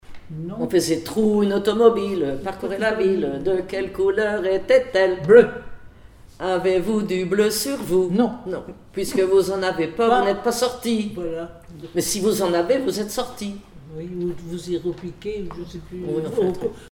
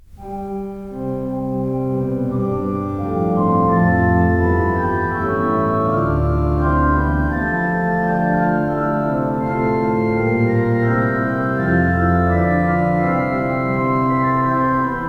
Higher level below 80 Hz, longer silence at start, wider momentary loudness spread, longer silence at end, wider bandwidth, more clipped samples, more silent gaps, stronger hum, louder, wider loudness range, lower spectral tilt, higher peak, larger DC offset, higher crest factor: second, -48 dBFS vs -30 dBFS; about the same, 0.1 s vs 0.1 s; first, 15 LU vs 7 LU; about the same, 0.05 s vs 0 s; first, 17.5 kHz vs 5.6 kHz; neither; neither; neither; second, -21 LUFS vs -18 LUFS; first, 7 LU vs 2 LU; second, -5 dB/octave vs -10 dB/octave; first, 0 dBFS vs -4 dBFS; neither; first, 20 dB vs 14 dB